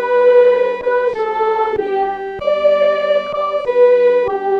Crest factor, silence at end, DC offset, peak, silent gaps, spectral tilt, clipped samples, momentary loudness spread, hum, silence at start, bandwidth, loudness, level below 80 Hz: 12 dB; 0 s; under 0.1%; -2 dBFS; none; -5 dB/octave; under 0.1%; 8 LU; none; 0 s; 6.2 kHz; -14 LUFS; -52 dBFS